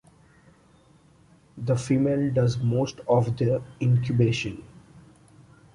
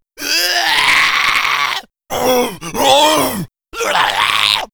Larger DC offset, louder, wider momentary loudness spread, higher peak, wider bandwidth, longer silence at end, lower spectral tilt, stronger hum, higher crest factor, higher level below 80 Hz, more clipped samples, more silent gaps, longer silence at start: neither; second, -25 LUFS vs -13 LUFS; second, 7 LU vs 11 LU; second, -8 dBFS vs 0 dBFS; second, 11 kHz vs over 20 kHz; first, 0.75 s vs 0.1 s; first, -7.5 dB/octave vs -1.5 dB/octave; neither; about the same, 18 dB vs 14 dB; second, -54 dBFS vs -46 dBFS; neither; neither; first, 1.55 s vs 0.2 s